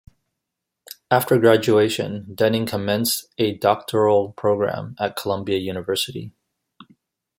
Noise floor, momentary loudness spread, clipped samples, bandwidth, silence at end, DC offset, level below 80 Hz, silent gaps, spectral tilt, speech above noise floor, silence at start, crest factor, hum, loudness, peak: -82 dBFS; 11 LU; under 0.1%; 16.5 kHz; 1.1 s; under 0.1%; -62 dBFS; none; -5 dB/octave; 62 dB; 0.9 s; 20 dB; none; -21 LUFS; -2 dBFS